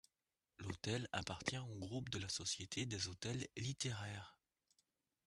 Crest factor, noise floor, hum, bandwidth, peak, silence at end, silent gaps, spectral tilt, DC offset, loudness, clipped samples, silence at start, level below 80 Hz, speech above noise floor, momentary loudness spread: 24 dB; under -90 dBFS; none; 12.5 kHz; -24 dBFS; 0.95 s; none; -3.5 dB/octave; under 0.1%; -45 LUFS; under 0.1%; 0.6 s; -72 dBFS; over 45 dB; 8 LU